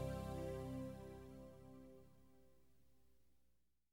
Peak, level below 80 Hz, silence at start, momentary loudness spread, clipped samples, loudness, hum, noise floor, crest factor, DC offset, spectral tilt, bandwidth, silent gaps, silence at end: -32 dBFS; -62 dBFS; 0 s; 16 LU; under 0.1%; -51 LUFS; 60 Hz at -80 dBFS; -82 dBFS; 20 dB; under 0.1%; -7 dB/octave; 19 kHz; none; 0 s